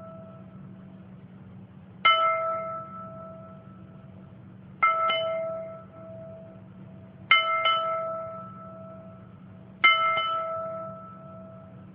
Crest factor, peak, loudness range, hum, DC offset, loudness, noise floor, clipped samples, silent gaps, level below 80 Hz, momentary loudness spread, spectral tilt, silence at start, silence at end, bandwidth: 24 dB; -6 dBFS; 4 LU; none; under 0.1%; -24 LUFS; -47 dBFS; under 0.1%; none; -70 dBFS; 27 LU; -7 dB/octave; 0 s; 0 s; 5.2 kHz